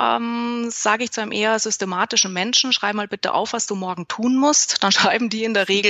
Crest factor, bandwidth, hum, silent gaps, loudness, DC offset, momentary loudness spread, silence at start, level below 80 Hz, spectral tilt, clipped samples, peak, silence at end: 18 dB; 8.6 kHz; none; none; -19 LUFS; under 0.1%; 8 LU; 0 s; -70 dBFS; -2 dB/octave; under 0.1%; -2 dBFS; 0 s